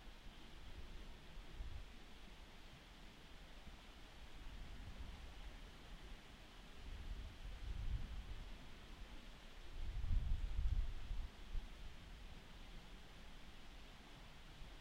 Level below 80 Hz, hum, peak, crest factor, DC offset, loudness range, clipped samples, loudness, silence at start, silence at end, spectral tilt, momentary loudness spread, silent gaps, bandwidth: -50 dBFS; none; -28 dBFS; 20 dB; under 0.1%; 9 LU; under 0.1%; -54 LUFS; 0 s; 0 s; -5 dB/octave; 14 LU; none; 13 kHz